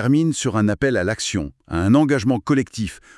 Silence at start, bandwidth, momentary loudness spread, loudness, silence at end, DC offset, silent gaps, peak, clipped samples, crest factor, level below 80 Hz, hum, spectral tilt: 0 s; 12 kHz; 11 LU; -20 LUFS; 0.2 s; under 0.1%; none; -2 dBFS; under 0.1%; 16 dB; -46 dBFS; none; -5.5 dB/octave